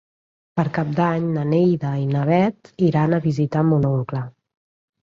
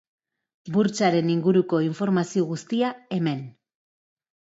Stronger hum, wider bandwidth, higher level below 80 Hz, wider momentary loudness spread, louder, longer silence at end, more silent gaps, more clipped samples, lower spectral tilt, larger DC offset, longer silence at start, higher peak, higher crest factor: neither; second, 7 kHz vs 8 kHz; first, -56 dBFS vs -70 dBFS; about the same, 6 LU vs 6 LU; first, -20 LUFS vs -24 LUFS; second, 0.75 s vs 1.05 s; neither; neither; first, -9.5 dB/octave vs -6.5 dB/octave; neither; about the same, 0.55 s vs 0.65 s; about the same, -6 dBFS vs -8 dBFS; about the same, 14 dB vs 18 dB